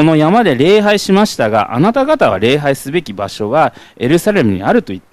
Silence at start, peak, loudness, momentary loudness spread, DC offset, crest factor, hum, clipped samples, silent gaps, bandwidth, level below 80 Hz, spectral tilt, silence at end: 0 s; 0 dBFS; -12 LUFS; 8 LU; under 0.1%; 12 dB; none; under 0.1%; none; 15 kHz; -44 dBFS; -6 dB/octave; 0.15 s